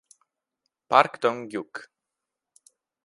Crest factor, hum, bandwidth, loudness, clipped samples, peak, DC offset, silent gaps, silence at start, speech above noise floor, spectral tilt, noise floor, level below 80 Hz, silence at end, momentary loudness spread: 28 dB; none; 11.5 kHz; -24 LUFS; under 0.1%; 0 dBFS; under 0.1%; none; 0.9 s; 62 dB; -4.5 dB/octave; -86 dBFS; -82 dBFS; 1.2 s; 19 LU